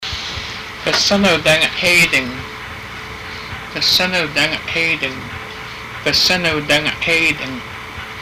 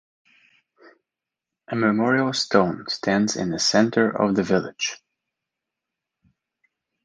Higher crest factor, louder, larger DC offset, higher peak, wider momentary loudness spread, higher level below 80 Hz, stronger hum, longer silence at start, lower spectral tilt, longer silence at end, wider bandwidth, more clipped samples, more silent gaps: second, 12 dB vs 22 dB; first, -14 LUFS vs -22 LUFS; neither; about the same, -6 dBFS vs -4 dBFS; first, 16 LU vs 9 LU; first, -42 dBFS vs -60 dBFS; neither; second, 0 s vs 1.7 s; second, -2.5 dB/octave vs -4.5 dB/octave; second, 0 s vs 2.1 s; first, 16 kHz vs 10 kHz; neither; neither